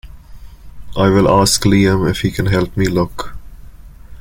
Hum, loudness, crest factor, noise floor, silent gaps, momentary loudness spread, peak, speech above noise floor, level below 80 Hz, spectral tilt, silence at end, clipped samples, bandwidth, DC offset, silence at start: none; -14 LUFS; 14 dB; -35 dBFS; none; 13 LU; -2 dBFS; 22 dB; -32 dBFS; -5 dB/octave; 0 s; under 0.1%; 17 kHz; under 0.1%; 0.05 s